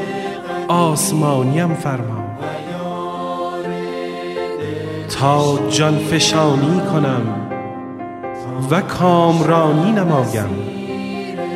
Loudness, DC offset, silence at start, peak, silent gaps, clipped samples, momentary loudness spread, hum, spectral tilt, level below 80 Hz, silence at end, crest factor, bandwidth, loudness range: -18 LUFS; under 0.1%; 0 s; 0 dBFS; none; under 0.1%; 12 LU; none; -5.5 dB/octave; -52 dBFS; 0 s; 16 dB; 15.5 kHz; 6 LU